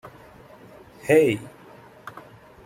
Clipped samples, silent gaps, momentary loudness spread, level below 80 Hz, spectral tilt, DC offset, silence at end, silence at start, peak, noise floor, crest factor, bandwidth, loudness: under 0.1%; none; 26 LU; -62 dBFS; -6 dB/octave; under 0.1%; 0.45 s; 0.05 s; -6 dBFS; -48 dBFS; 20 dB; 16 kHz; -21 LUFS